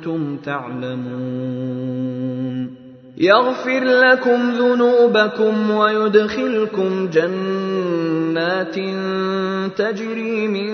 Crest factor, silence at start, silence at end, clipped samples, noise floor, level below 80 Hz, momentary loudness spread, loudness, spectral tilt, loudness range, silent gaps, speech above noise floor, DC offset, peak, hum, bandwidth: 18 dB; 0 s; 0 s; under 0.1%; -39 dBFS; -64 dBFS; 12 LU; -18 LUFS; -6.5 dB/octave; 6 LU; none; 21 dB; under 0.1%; 0 dBFS; none; 6.6 kHz